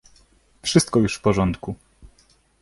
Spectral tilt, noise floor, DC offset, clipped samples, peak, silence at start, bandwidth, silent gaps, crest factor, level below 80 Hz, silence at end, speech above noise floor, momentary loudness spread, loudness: -5 dB/octave; -59 dBFS; under 0.1%; under 0.1%; -4 dBFS; 0.65 s; 11.5 kHz; none; 20 dB; -44 dBFS; 0.85 s; 39 dB; 15 LU; -21 LUFS